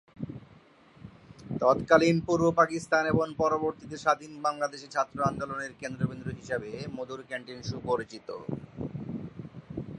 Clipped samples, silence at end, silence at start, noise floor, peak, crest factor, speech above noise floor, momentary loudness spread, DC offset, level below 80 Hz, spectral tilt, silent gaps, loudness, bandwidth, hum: under 0.1%; 0 s; 0.15 s; -57 dBFS; -6 dBFS; 24 dB; 28 dB; 16 LU; under 0.1%; -58 dBFS; -6 dB/octave; none; -29 LUFS; 11.5 kHz; none